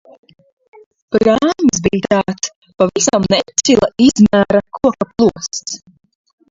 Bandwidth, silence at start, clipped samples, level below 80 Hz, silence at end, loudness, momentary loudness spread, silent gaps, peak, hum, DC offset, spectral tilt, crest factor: 7.8 kHz; 1.1 s; under 0.1%; -44 dBFS; 0.75 s; -14 LUFS; 12 LU; 2.56-2.62 s; 0 dBFS; none; under 0.1%; -4.5 dB/octave; 14 dB